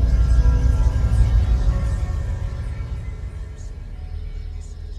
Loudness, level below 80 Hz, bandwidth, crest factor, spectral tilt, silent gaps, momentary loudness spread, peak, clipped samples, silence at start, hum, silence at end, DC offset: -22 LUFS; -20 dBFS; 8.4 kHz; 14 dB; -7.5 dB/octave; none; 16 LU; -4 dBFS; under 0.1%; 0 s; none; 0 s; under 0.1%